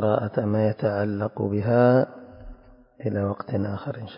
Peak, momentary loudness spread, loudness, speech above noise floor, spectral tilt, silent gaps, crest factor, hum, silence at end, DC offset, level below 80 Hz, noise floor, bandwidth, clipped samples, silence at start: -6 dBFS; 12 LU; -24 LUFS; 26 dB; -12.5 dB/octave; none; 18 dB; none; 0 s; under 0.1%; -50 dBFS; -49 dBFS; 5.4 kHz; under 0.1%; 0 s